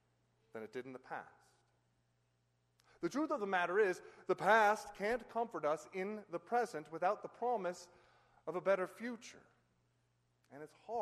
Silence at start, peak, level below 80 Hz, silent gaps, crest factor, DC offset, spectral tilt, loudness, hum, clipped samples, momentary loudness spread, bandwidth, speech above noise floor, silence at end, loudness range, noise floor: 0.55 s; -18 dBFS; -78 dBFS; none; 22 dB; under 0.1%; -4.5 dB/octave; -38 LUFS; 60 Hz at -75 dBFS; under 0.1%; 18 LU; 13 kHz; 41 dB; 0 s; 8 LU; -79 dBFS